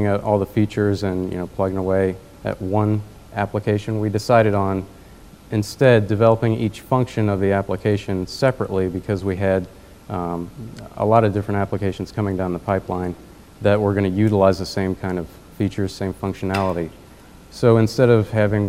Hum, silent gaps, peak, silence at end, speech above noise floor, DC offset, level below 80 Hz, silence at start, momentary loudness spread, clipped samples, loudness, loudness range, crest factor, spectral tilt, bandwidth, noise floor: none; none; 0 dBFS; 0 s; 25 dB; 0.3%; -46 dBFS; 0 s; 12 LU; under 0.1%; -20 LUFS; 4 LU; 20 dB; -7.5 dB/octave; 15 kHz; -44 dBFS